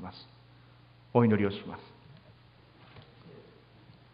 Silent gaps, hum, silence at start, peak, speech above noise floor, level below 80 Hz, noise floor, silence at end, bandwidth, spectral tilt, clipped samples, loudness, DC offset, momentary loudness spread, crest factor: none; none; 0 s; -8 dBFS; 30 dB; -62 dBFS; -58 dBFS; 0.85 s; 5.2 kHz; -11 dB/octave; under 0.1%; -28 LUFS; under 0.1%; 29 LU; 26 dB